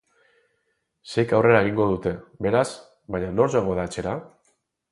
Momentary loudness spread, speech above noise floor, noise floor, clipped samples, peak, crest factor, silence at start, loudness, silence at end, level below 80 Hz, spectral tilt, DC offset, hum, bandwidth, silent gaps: 13 LU; 51 dB; -73 dBFS; under 0.1%; -2 dBFS; 22 dB; 1.05 s; -23 LUFS; 0.65 s; -50 dBFS; -6.5 dB/octave; under 0.1%; none; 11.5 kHz; none